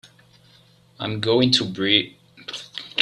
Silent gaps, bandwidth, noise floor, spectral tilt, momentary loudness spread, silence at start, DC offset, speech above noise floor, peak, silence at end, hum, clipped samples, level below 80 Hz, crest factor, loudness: none; 12 kHz; -54 dBFS; -4.5 dB/octave; 17 LU; 1 s; under 0.1%; 34 dB; -2 dBFS; 0 s; none; under 0.1%; -62 dBFS; 22 dB; -20 LUFS